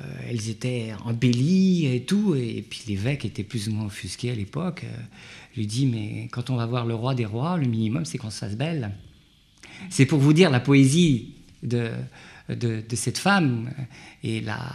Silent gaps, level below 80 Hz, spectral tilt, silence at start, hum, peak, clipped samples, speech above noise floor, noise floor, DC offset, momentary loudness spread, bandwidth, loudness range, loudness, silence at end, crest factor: none; -56 dBFS; -6 dB/octave; 0 s; none; -4 dBFS; under 0.1%; 32 dB; -56 dBFS; under 0.1%; 17 LU; 13 kHz; 8 LU; -24 LUFS; 0 s; 20 dB